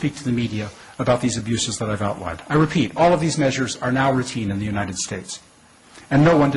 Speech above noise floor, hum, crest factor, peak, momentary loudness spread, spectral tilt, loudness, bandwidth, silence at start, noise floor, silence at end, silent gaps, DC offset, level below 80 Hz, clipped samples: 29 dB; none; 14 dB; -8 dBFS; 11 LU; -5.5 dB/octave; -21 LUFS; 11.5 kHz; 0 s; -49 dBFS; 0 s; none; under 0.1%; -46 dBFS; under 0.1%